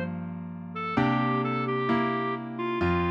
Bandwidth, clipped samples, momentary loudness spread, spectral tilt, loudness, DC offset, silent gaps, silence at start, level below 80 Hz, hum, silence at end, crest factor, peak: 7 kHz; under 0.1%; 11 LU; -8.5 dB/octave; -28 LUFS; under 0.1%; none; 0 s; -52 dBFS; none; 0 s; 16 dB; -12 dBFS